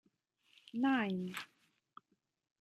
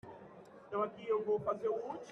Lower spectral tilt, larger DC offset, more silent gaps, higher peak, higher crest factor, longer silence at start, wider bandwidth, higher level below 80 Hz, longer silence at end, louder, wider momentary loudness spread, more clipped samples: about the same, -6 dB/octave vs -7 dB/octave; neither; neither; about the same, -24 dBFS vs -22 dBFS; about the same, 18 dB vs 16 dB; first, 0.75 s vs 0.05 s; first, 13 kHz vs 6.6 kHz; second, -86 dBFS vs -76 dBFS; first, 1.15 s vs 0 s; about the same, -37 LUFS vs -37 LUFS; second, 14 LU vs 20 LU; neither